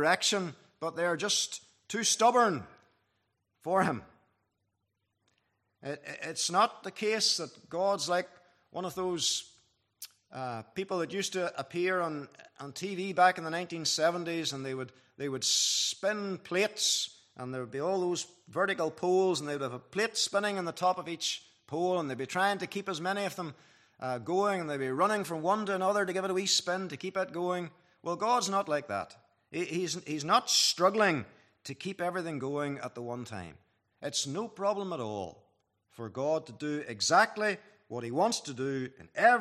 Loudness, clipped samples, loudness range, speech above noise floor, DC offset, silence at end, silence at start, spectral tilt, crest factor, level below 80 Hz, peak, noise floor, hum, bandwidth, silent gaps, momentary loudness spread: -31 LUFS; under 0.1%; 6 LU; 50 dB; under 0.1%; 0 s; 0 s; -2.5 dB/octave; 22 dB; -78 dBFS; -10 dBFS; -81 dBFS; none; 14.5 kHz; none; 15 LU